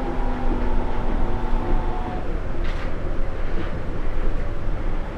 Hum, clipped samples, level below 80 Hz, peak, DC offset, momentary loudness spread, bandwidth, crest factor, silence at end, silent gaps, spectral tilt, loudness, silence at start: none; under 0.1%; -22 dBFS; -8 dBFS; under 0.1%; 4 LU; 4.9 kHz; 12 dB; 0 s; none; -8 dB/octave; -29 LUFS; 0 s